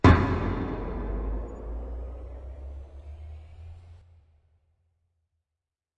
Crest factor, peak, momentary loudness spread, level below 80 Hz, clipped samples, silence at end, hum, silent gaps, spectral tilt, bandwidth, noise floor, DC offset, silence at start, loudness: 26 dB; -4 dBFS; 19 LU; -38 dBFS; under 0.1%; 2 s; none; none; -8 dB/octave; 7.8 kHz; -89 dBFS; under 0.1%; 0.05 s; -31 LUFS